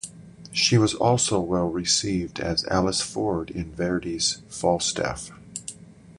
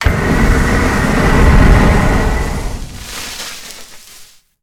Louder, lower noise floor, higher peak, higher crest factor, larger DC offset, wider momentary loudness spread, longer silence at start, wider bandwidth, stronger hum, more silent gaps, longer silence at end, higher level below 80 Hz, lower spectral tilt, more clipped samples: second, -24 LUFS vs -13 LUFS; first, -44 dBFS vs -40 dBFS; second, -6 dBFS vs 0 dBFS; first, 20 dB vs 12 dB; neither; about the same, 16 LU vs 17 LU; about the same, 0.05 s vs 0 s; second, 11.5 kHz vs 16.5 kHz; neither; neither; second, 0.05 s vs 0.4 s; second, -46 dBFS vs -16 dBFS; second, -4 dB/octave vs -5.5 dB/octave; neither